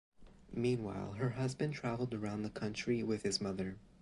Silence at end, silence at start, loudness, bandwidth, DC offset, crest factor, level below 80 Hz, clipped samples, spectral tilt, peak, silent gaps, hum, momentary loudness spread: 0.15 s; 0.2 s; -39 LUFS; 11.5 kHz; under 0.1%; 16 dB; -62 dBFS; under 0.1%; -5.5 dB/octave; -22 dBFS; none; none; 6 LU